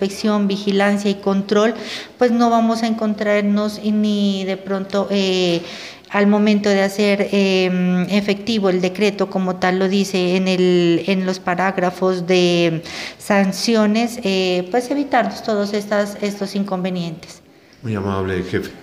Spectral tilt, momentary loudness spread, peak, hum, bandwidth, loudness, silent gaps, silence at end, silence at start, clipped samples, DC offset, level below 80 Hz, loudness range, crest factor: -5.5 dB/octave; 8 LU; -2 dBFS; none; 15 kHz; -18 LUFS; none; 0 s; 0 s; under 0.1%; under 0.1%; -58 dBFS; 3 LU; 16 dB